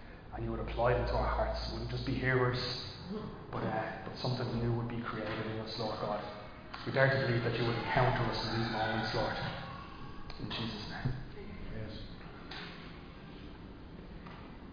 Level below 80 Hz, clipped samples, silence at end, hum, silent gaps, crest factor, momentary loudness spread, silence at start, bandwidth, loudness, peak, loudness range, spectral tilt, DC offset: -48 dBFS; under 0.1%; 0 s; none; none; 22 dB; 18 LU; 0 s; 5.2 kHz; -35 LUFS; -14 dBFS; 10 LU; -4.5 dB/octave; under 0.1%